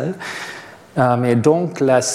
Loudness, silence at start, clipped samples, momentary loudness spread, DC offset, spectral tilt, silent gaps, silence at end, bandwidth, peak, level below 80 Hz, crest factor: -18 LUFS; 0 s; under 0.1%; 14 LU; under 0.1%; -5.5 dB/octave; none; 0 s; 14.5 kHz; -2 dBFS; -60 dBFS; 16 dB